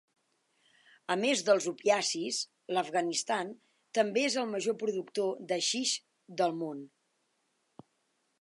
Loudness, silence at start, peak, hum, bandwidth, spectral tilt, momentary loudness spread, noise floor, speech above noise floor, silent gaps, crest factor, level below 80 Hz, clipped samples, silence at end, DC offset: -31 LUFS; 1.1 s; -12 dBFS; none; 11.5 kHz; -2.5 dB/octave; 9 LU; -77 dBFS; 46 dB; none; 22 dB; -88 dBFS; under 0.1%; 1.55 s; under 0.1%